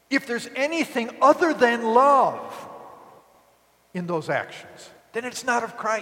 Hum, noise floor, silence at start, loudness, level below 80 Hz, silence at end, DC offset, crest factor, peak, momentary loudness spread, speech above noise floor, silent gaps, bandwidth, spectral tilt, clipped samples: none; -60 dBFS; 0.1 s; -22 LUFS; -74 dBFS; 0 s; under 0.1%; 20 dB; -4 dBFS; 19 LU; 38 dB; none; 17 kHz; -4.5 dB/octave; under 0.1%